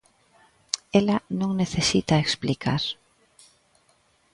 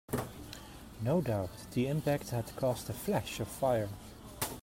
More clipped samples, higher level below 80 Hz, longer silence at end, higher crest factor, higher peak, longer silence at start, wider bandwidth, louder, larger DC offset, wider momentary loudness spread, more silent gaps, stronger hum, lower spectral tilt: neither; about the same, -52 dBFS vs -56 dBFS; first, 1.4 s vs 0 s; first, 26 dB vs 16 dB; first, 0 dBFS vs -18 dBFS; first, 0.75 s vs 0.1 s; second, 11.5 kHz vs 16.5 kHz; first, -24 LUFS vs -35 LUFS; neither; second, 9 LU vs 15 LU; neither; neither; second, -4.5 dB/octave vs -6 dB/octave